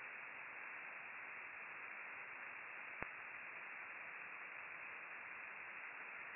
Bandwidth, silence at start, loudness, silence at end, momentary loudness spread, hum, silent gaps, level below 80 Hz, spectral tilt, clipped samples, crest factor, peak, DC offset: 2.9 kHz; 0 s; -50 LUFS; 0 s; 1 LU; none; none; -84 dBFS; 3.5 dB/octave; under 0.1%; 30 dB; -22 dBFS; under 0.1%